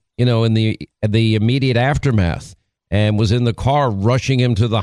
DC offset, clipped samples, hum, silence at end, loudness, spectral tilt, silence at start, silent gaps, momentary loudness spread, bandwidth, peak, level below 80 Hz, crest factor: under 0.1%; under 0.1%; none; 0 s; -17 LUFS; -7 dB/octave; 0.2 s; none; 5 LU; 10.5 kHz; -2 dBFS; -38 dBFS; 14 dB